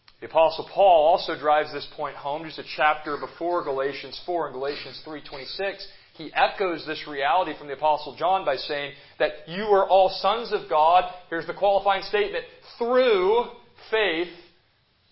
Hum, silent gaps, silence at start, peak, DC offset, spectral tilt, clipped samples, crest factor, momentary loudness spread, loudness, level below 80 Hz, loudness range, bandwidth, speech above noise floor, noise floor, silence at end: none; none; 0.2 s; -6 dBFS; under 0.1%; -8 dB/octave; under 0.1%; 18 dB; 15 LU; -24 LUFS; -58 dBFS; 6 LU; 5.8 kHz; 41 dB; -64 dBFS; 0.7 s